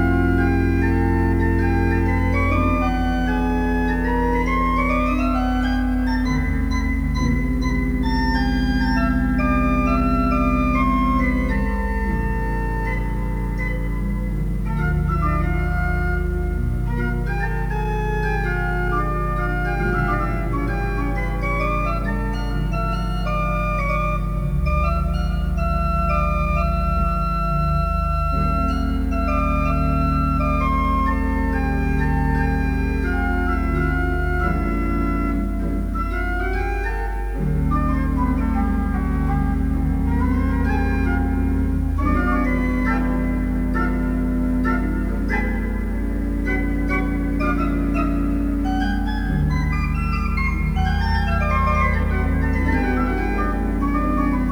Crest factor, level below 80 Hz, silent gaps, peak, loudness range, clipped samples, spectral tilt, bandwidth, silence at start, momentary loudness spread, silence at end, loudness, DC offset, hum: 14 dB; -24 dBFS; none; -6 dBFS; 3 LU; under 0.1%; -8 dB/octave; 10 kHz; 0 s; 5 LU; 0 s; -21 LUFS; under 0.1%; none